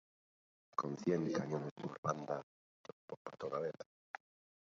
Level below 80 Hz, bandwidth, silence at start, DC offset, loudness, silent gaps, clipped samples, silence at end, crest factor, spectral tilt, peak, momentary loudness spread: -80 dBFS; 7.4 kHz; 0.8 s; under 0.1%; -41 LUFS; 1.71-1.76 s, 1.98-2.03 s, 2.43-2.84 s, 2.92-3.08 s, 3.17-3.25 s; under 0.1%; 0.85 s; 22 dB; -6.5 dB/octave; -20 dBFS; 17 LU